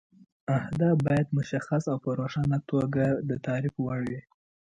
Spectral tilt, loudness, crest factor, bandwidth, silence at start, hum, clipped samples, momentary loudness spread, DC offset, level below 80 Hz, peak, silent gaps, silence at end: -8.5 dB/octave; -28 LUFS; 16 dB; 8.8 kHz; 0.5 s; none; under 0.1%; 6 LU; under 0.1%; -58 dBFS; -12 dBFS; none; 0.55 s